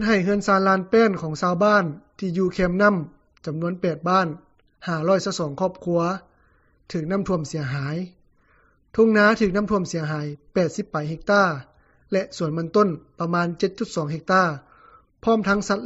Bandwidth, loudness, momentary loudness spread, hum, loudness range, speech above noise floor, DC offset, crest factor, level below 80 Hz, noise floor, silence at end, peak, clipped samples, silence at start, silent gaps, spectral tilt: 8 kHz; -22 LUFS; 12 LU; none; 4 LU; 38 dB; under 0.1%; 18 dB; -50 dBFS; -60 dBFS; 0 s; -6 dBFS; under 0.1%; 0 s; none; -5.5 dB/octave